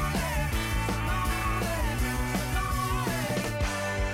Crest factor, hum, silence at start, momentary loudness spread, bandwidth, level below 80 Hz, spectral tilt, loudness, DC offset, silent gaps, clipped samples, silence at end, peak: 10 dB; none; 0 s; 1 LU; 16.5 kHz; -34 dBFS; -4.5 dB/octave; -29 LUFS; under 0.1%; none; under 0.1%; 0 s; -20 dBFS